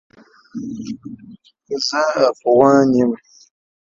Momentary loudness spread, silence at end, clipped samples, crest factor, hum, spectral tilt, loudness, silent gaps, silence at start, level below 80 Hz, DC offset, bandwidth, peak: 20 LU; 0.8 s; under 0.1%; 18 dB; none; -5 dB/octave; -16 LUFS; none; 0.55 s; -58 dBFS; under 0.1%; 7.6 kHz; 0 dBFS